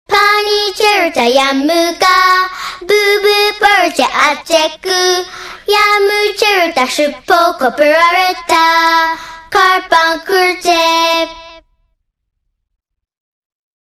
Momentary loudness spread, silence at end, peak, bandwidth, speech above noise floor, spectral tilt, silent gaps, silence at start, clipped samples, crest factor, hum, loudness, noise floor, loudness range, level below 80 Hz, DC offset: 5 LU; 2.25 s; 0 dBFS; 16 kHz; 52 dB; -1 dB/octave; none; 0.1 s; 0.2%; 12 dB; none; -10 LUFS; -63 dBFS; 3 LU; -48 dBFS; under 0.1%